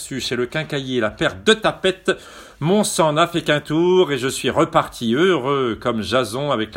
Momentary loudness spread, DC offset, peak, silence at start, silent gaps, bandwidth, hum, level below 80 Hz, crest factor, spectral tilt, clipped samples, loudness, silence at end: 6 LU; under 0.1%; 0 dBFS; 0 s; none; 16.5 kHz; none; -50 dBFS; 18 dB; -4.5 dB/octave; under 0.1%; -19 LUFS; 0 s